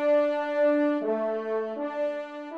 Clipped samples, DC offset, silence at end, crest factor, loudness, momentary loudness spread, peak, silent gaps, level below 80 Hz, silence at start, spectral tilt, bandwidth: under 0.1%; under 0.1%; 0 s; 12 dB; -27 LUFS; 8 LU; -14 dBFS; none; -82 dBFS; 0 s; -6.5 dB/octave; 6.6 kHz